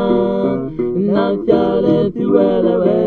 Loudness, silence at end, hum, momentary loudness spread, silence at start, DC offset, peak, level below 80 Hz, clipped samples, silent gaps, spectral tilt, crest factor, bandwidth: -15 LUFS; 0 s; none; 5 LU; 0 s; under 0.1%; 0 dBFS; -42 dBFS; under 0.1%; none; -10 dB/octave; 14 dB; 4.7 kHz